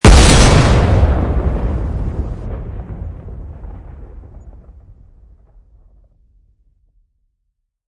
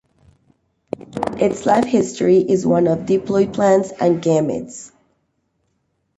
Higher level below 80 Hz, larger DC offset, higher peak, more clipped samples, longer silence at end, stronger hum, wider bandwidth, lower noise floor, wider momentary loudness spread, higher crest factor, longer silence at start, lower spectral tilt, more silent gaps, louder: first, -18 dBFS vs -54 dBFS; neither; about the same, 0 dBFS vs -2 dBFS; neither; first, 3.15 s vs 1.3 s; neither; first, 11.5 kHz vs 9 kHz; about the same, -71 dBFS vs -68 dBFS; first, 26 LU vs 15 LU; about the same, 16 dB vs 16 dB; second, 0.05 s vs 1 s; second, -5 dB/octave vs -6.5 dB/octave; neither; first, -13 LUFS vs -17 LUFS